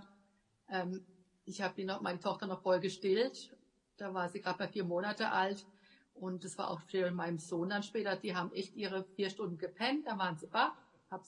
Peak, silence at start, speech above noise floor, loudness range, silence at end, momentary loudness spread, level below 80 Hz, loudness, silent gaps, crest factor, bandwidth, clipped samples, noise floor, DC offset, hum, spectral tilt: -18 dBFS; 0 s; 36 dB; 2 LU; 0.05 s; 11 LU; -86 dBFS; -38 LUFS; none; 20 dB; 11 kHz; under 0.1%; -74 dBFS; under 0.1%; none; -5 dB/octave